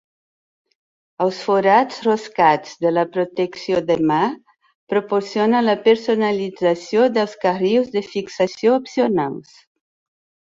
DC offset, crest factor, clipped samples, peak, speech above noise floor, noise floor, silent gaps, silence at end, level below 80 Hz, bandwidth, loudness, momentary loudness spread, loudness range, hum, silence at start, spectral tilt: under 0.1%; 18 dB; under 0.1%; -2 dBFS; over 72 dB; under -90 dBFS; 4.75-4.87 s; 1.1 s; -64 dBFS; 7.8 kHz; -19 LUFS; 7 LU; 2 LU; none; 1.2 s; -6 dB/octave